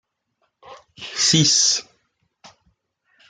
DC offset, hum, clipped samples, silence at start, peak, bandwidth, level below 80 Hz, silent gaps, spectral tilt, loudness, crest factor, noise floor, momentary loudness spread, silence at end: under 0.1%; none; under 0.1%; 0.65 s; -4 dBFS; 11 kHz; -64 dBFS; none; -2 dB/octave; -16 LUFS; 20 dB; -71 dBFS; 17 LU; 1.45 s